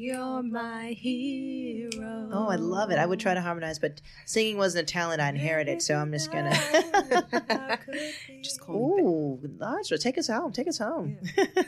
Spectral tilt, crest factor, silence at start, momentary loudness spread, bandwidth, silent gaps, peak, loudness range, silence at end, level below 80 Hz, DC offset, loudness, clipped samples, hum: -4.5 dB/octave; 18 dB; 0 s; 10 LU; 15 kHz; none; -10 dBFS; 3 LU; 0 s; -64 dBFS; under 0.1%; -28 LUFS; under 0.1%; none